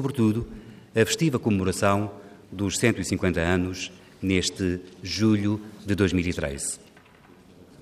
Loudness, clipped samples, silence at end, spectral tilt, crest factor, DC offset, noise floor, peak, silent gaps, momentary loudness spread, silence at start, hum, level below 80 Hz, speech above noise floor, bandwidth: -25 LUFS; under 0.1%; 0.2 s; -5 dB/octave; 20 dB; under 0.1%; -52 dBFS; -6 dBFS; none; 12 LU; 0 s; none; -50 dBFS; 28 dB; 15.5 kHz